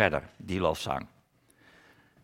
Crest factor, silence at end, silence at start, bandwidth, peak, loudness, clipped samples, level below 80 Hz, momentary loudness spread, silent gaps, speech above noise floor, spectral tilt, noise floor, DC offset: 26 dB; 1.15 s; 0 s; 17 kHz; -6 dBFS; -31 LUFS; under 0.1%; -56 dBFS; 8 LU; none; 35 dB; -5 dB/octave; -65 dBFS; under 0.1%